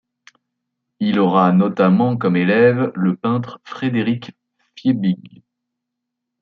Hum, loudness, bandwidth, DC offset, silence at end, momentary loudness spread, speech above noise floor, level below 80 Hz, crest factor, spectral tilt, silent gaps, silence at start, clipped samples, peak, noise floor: none; -17 LUFS; 4.9 kHz; under 0.1%; 1.25 s; 10 LU; 63 dB; -64 dBFS; 16 dB; -9 dB/octave; none; 1 s; under 0.1%; -2 dBFS; -80 dBFS